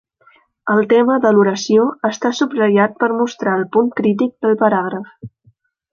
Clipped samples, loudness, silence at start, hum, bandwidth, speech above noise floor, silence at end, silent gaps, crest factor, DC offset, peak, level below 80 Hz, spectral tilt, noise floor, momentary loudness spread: under 0.1%; -15 LUFS; 0.65 s; none; 7.2 kHz; 41 dB; 0.65 s; none; 14 dB; under 0.1%; -2 dBFS; -62 dBFS; -6 dB/octave; -56 dBFS; 6 LU